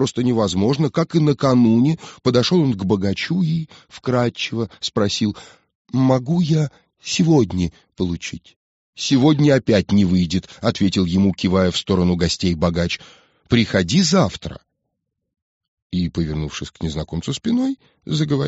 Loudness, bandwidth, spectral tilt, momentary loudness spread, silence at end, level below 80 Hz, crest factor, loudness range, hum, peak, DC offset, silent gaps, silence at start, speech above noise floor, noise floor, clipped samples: -19 LUFS; 8 kHz; -6 dB/octave; 11 LU; 0 s; -44 dBFS; 18 dB; 5 LU; none; -2 dBFS; under 0.1%; 5.75-5.85 s, 8.56-8.93 s, 15.42-15.61 s, 15.68-15.90 s; 0 s; 58 dB; -77 dBFS; under 0.1%